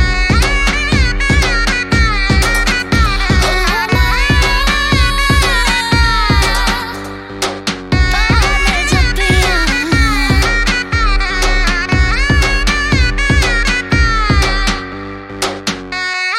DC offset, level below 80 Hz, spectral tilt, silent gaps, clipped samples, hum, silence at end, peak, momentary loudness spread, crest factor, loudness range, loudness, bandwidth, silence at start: under 0.1%; -16 dBFS; -4 dB/octave; none; under 0.1%; none; 0 s; 0 dBFS; 7 LU; 12 dB; 2 LU; -13 LUFS; 15.5 kHz; 0 s